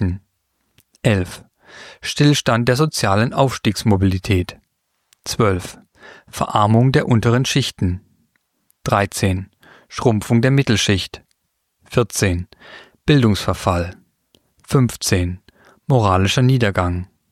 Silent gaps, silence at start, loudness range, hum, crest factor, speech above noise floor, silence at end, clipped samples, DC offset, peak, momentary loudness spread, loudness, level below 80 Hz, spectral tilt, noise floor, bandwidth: none; 0 s; 3 LU; none; 18 dB; 54 dB; 0.25 s; under 0.1%; under 0.1%; -2 dBFS; 15 LU; -18 LUFS; -42 dBFS; -5.5 dB/octave; -71 dBFS; 15 kHz